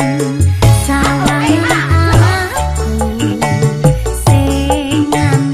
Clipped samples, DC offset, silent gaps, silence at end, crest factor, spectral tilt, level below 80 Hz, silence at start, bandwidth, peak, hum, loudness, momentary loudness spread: under 0.1%; under 0.1%; none; 0 s; 12 dB; -5.5 dB/octave; -22 dBFS; 0 s; 15.5 kHz; 0 dBFS; none; -12 LUFS; 5 LU